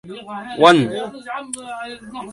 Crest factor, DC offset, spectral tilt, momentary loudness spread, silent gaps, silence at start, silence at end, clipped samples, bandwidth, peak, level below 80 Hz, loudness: 20 dB; under 0.1%; -4.5 dB/octave; 19 LU; none; 0.05 s; 0 s; under 0.1%; 11.5 kHz; 0 dBFS; -60 dBFS; -17 LUFS